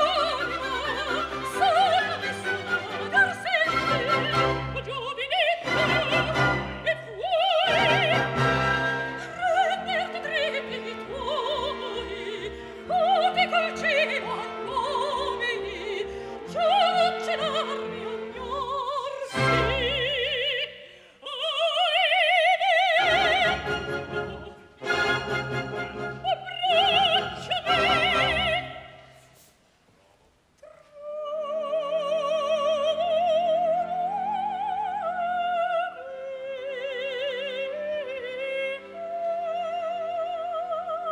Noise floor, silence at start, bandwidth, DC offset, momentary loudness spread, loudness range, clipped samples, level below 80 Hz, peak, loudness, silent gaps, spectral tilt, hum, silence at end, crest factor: -62 dBFS; 0 s; 16 kHz; under 0.1%; 13 LU; 8 LU; under 0.1%; -50 dBFS; -8 dBFS; -25 LUFS; none; -4 dB/octave; none; 0 s; 18 dB